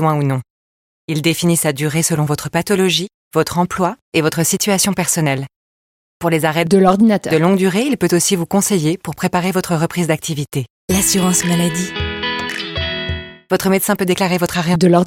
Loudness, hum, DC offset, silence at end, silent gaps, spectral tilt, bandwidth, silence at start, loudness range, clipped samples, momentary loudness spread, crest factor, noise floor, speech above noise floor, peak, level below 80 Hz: -16 LUFS; none; under 0.1%; 0 s; 0.50-1.08 s, 3.14-3.31 s, 4.02-4.12 s, 5.56-6.20 s, 10.70-10.88 s; -4.5 dB/octave; 17 kHz; 0 s; 3 LU; under 0.1%; 8 LU; 16 dB; under -90 dBFS; over 75 dB; 0 dBFS; -42 dBFS